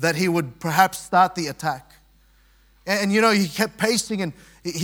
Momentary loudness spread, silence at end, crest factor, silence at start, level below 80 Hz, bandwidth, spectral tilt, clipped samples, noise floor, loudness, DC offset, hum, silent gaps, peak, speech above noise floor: 13 LU; 0 s; 22 dB; 0 s; -58 dBFS; 18 kHz; -4 dB/octave; under 0.1%; -56 dBFS; -21 LUFS; under 0.1%; none; none; 0 dBFS; 35 dB